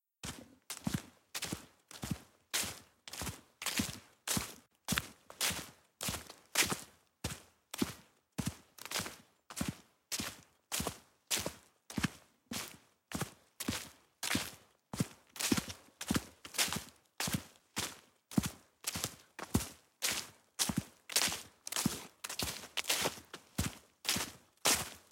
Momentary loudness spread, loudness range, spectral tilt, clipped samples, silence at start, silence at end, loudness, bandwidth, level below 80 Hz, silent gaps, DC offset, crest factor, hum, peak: 14 LU; 5 LU; -2.5 dB/octave; under 0.1%; 0.25 s; 0.1 s; -38 LUFS; 17 kHz; -60 dBFS; none; under 0.1%; 30 dB; none; -10 dBFS